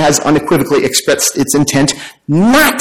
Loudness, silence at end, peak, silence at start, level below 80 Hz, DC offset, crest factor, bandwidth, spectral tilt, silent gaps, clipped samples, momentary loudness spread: -11 LUFS; 0 s; 0 dBFS; 0 s; -40 dBFS; under 0.1%; 10 dB; 17 kHz; -3.5 dB/octave; none; under 0.1%; 6 LU